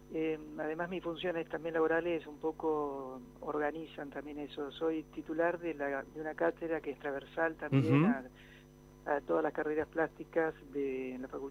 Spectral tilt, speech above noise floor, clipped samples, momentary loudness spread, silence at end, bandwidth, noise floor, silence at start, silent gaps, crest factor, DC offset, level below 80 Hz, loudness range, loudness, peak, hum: -8 dB/octave; 22 dB; under 0.1%; 11 LU; 0 s; 15.5 kHz; -57 dBFS; 0 s; none; 20 dB; under 0.1%; -64 dBFS; 4 LU; -36 LUFS; -16 dBFS; none